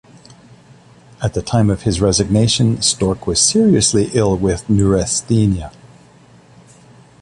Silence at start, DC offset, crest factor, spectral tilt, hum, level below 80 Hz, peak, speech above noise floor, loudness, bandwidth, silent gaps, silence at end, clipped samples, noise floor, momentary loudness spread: 1.2 s; under 0.1%; 16 dB; -5 dB/octave; none; -34 dBFS; 0 dBFS; 31 dB; -15 LUFS; 11.5 kHz; none; 1.5 s; under 0.1%; -46 dBFS; 7 LU